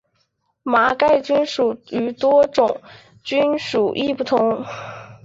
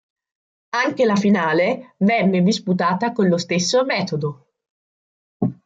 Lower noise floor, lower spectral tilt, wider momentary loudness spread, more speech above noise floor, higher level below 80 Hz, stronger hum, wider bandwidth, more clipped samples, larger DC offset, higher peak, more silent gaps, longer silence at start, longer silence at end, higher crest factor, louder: second, -68 dBFS vs under -90 dBFS; about the same, -5 dB/octave vs -5.5 dB/octave; first, 15 LU vs 9 LU; second, 49 dB vs over 72 dB; about the same, -58 dBFS vs -62 dBFS; neither; about the same, 7.8 kHz vs 7.8 kHz; neither; neither; about the same, -4 dBFS vs -4 dBFS; second, none vs 4.70-5.40 s; about the same, 0.65 s vs 0.75 s; about the same, 0.1 s vs 0.15 s; about the same, 16 dB vs 16 dB; about the same, -18 LUFS vs -19 LUFS